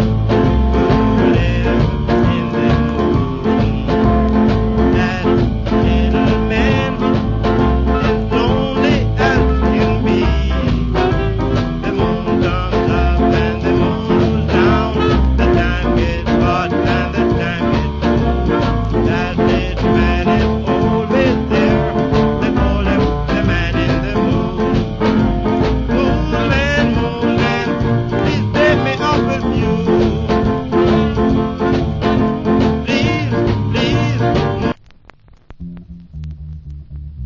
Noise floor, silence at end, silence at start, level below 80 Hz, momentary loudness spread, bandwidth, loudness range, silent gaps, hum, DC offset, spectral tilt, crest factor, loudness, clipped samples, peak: -44 dBFS; 0 s; 0 s; -22 dBFS; 3 LU; 7.4 kHz; 1 LU; none; none; under 0.1%; -7.5 dB/octave; 14 dB; -15 LUFS; under 0.1%; 0 dBFS